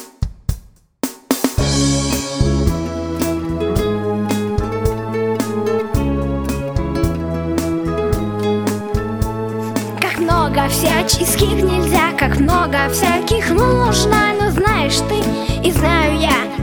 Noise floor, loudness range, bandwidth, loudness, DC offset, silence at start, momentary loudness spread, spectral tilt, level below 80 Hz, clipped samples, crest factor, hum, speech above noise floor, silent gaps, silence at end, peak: -37 dBFS; 5 LU; over 20 kHz; -17 LUFS; 0.3%; 0 s; 7 LU; -5 dB/octave; -26 dBFS; under 0.1%; 16 dB; none; 23 dB; none; 0 s; 0 dBFS